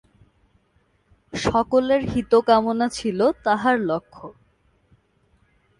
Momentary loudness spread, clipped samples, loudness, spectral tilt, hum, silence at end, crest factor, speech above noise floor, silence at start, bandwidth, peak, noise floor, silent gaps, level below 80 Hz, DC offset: 15 LU; under 0.1%; -21 LUFS; -5.5 dB/octave; none; 1.5 s; 18 dB; 44 dB; 1.35 s; 11.5 kHz; -4 dBFS; -64 dBFS; none; -50 dBFS; under 0.1%